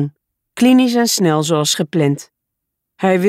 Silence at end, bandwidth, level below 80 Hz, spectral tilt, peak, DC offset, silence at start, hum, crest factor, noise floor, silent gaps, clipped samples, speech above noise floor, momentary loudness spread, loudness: 0 s; 16 kHz; -64 dBFS; -4.5 dB/octave; -2 dBFS; under 0.1%; 0 s; none; 12 dB; -77 dBFS; none; under 0.1%; 64 dB; 12 LU; -15 LUFS